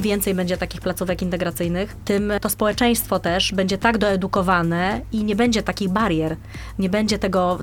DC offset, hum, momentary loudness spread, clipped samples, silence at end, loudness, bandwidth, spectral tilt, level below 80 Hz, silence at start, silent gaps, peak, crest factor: under 0.1%; none; 6 LU; under 0.1%; 0 s; -21 LUFS; 17.5 kHz; -5 dB/octave; -38 dBFS; 0 s; none; -2 dBFS; 18 dB